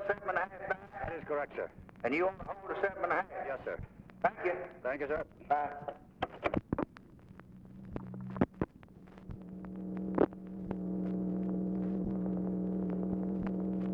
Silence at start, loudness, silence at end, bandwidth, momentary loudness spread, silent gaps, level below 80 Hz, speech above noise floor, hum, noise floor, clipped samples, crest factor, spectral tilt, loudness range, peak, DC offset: 0 s; -37 LUFS; 0 s; 5.4 kHz; 14 LU; none; -58 dBFS; 19 dB; none; -55 dBFS; under 0.1%; 22 dB; -9.5 dB/octave; 4 LU; -14 dBFS; under 0.1%